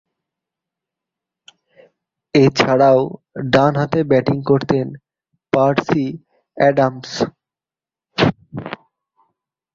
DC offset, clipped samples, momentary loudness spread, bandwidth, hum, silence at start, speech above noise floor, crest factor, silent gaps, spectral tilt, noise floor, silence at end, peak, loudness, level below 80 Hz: under 0.1%; under 0.1%; 16 LU; 7.6 kHz; none; 2.35 s; over 75 dB; 18 dB; none; -6.5 dB/octave; under -90 dBFS; 1 s; 0 dBFS; -17 LUFS; -52 dBFS